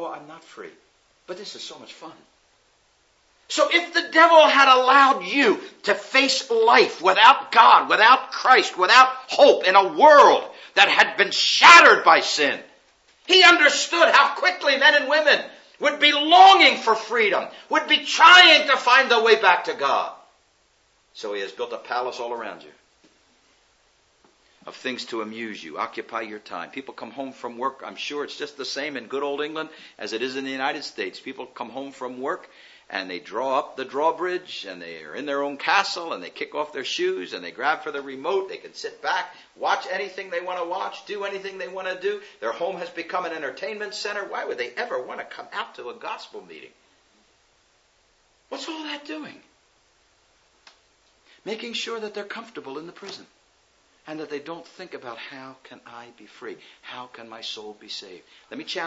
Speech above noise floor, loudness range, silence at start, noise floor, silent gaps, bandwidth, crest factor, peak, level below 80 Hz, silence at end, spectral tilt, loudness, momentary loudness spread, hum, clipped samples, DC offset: 42 dB; 24 LU; 0 s; -63 dBFS; none; 8 kHz; 22 dB; 0 dBFS; -80 dBFS; 0 s; -1 dB/octave; -18 LUFS; 23 LU; none; under 0.1%; under 0.1%